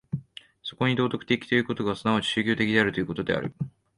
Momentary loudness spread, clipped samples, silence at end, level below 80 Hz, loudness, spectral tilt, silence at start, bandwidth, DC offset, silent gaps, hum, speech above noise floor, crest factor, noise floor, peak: 13 LU; under 0.1%; 0.3 s; -58 dBFS; -26 LUFS; -6 dB/octave; 0.15 s; 11 kHz; under 0.1%; none; none; 20 dB; 20 dB; -45 dBFS; -6 dBFS